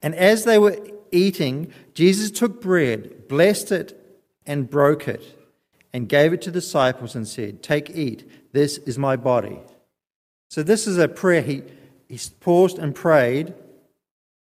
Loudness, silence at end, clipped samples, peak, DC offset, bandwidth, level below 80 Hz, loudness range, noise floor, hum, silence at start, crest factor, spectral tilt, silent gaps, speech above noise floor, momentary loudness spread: -20 LUFS; 1 s; under 0.1%; -2 dBFS; under 0.1%; 15.5 kHz; -62 dBFS; 4 LU; -61 dBFS; none; 0.05 s; 18 dB; -5.5 dB/octave; 10.15-10.50 s; 41 dB; 15 LU